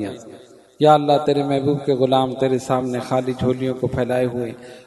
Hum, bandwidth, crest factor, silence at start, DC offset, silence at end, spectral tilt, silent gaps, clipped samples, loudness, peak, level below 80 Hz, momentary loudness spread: none; 12 kHz; 20 dB; 0 s; under 0.1%; 0.05 s; -7 dB/octave; none; under 0.1%; -19 LUFS; 0 dBFS; -50 dBFS; 8 LU